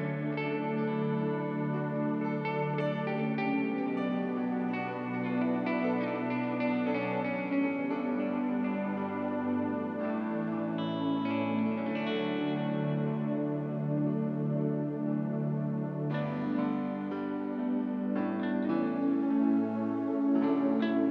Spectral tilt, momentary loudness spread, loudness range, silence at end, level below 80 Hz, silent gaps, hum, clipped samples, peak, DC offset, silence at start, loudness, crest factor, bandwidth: -9.5 dB/octave; 5 LU; 2 LU; 0 s; -76 dBFS; none; none; under 0.1%; -18 dBFS; under 0.1%; 0 s; -32 LUFS; 14 dB; 5.4 kHz